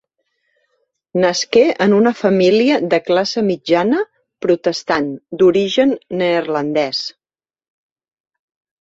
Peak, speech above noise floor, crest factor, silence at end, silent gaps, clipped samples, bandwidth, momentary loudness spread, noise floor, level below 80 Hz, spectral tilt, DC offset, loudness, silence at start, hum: 0 dBFS; over 75 dB; 16 dB; 1.7 s; none; under 0.1%; 7.8 kHz; 8 LU; under -90 dBFS; -60 dBFS; -5 dB/octave; under 0.1%; -16 LUFS; 1.15 s; none